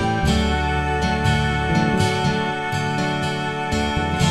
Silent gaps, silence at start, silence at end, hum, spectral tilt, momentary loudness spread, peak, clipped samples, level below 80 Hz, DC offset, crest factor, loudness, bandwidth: none; 0 s; 0 s; none; -5.5 dB/octave; 4 LU; -6 dBFS; under 0.1%; -30 dBFS; 0.6%; 14 dB; -21 LUFS; 13.5 kHz